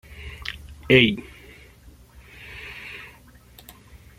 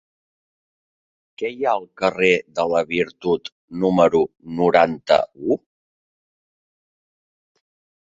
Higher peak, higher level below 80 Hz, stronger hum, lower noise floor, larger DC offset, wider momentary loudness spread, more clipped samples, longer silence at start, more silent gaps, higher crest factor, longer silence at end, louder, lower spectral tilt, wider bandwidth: about the same, 0 dBFS vs -2 dBFS; first, -48 dBFS vs -58 dBFS; first, 60 Hz at -55 dBFS vs none; second, -50 dBFS vs under -90 dBFS; neither; first, 28 LU vs 9 LU; neither; second, 0.1 s vs 1.4 s; second, none vs 3.52-3.68 s; first, 26 dB vs 20 dB; second, 1.15 s vs 2.55 s; about the same, -20 LUFS vs -20 LUFS; about the same, -6 dB/octave vs -6 dB/octave; first, 16 kHz vs 7.8 kHz